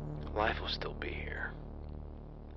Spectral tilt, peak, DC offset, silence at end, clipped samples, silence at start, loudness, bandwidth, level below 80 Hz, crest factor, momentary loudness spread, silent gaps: -6.5 dB/octave; -18 dBFS; under 0.1%; 0 s; under 0.1%; 0 s; -38 LUFS; 6.6 kHz; -46 dBFS; 22 dB; 14 LU; none